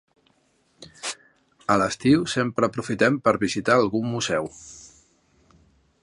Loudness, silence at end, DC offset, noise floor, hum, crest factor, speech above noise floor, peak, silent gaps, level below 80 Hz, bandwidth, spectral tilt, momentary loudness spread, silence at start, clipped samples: -23 LUFS; 1.15 s; under 0.1%; -65 dBFS; none; 20 dB; 43 dB; -4 dBFS; none; -56 dBFS; 11.5 kHz; -5 dB/octave; 16 LU; 0.8 s; under 0.1%